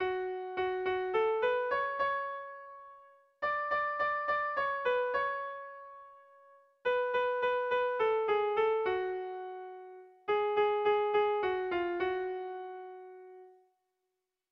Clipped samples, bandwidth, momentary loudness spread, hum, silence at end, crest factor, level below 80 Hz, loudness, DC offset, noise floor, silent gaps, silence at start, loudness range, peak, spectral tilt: under 0.1%; 6 kHz; 18 LU; none; 1 s; 14 dB; -70 dBFS; -32 LUFS; under 0.1%; -86 dBFS; none; 0 s; 2 LU; -20 dBFS; -5.5 dB/octave